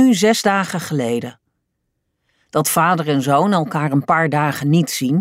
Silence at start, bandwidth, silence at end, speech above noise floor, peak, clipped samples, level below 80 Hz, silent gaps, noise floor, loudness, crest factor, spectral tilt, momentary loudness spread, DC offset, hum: 0 s; 16 kHz; 0 s; 56 dB; -2 dBFS; under 0.1%; -62 dBFS; none; -73 dBFS; -17 LUFS; 14 dB; -5 dB/octave; 7 LU; under 0.1%; none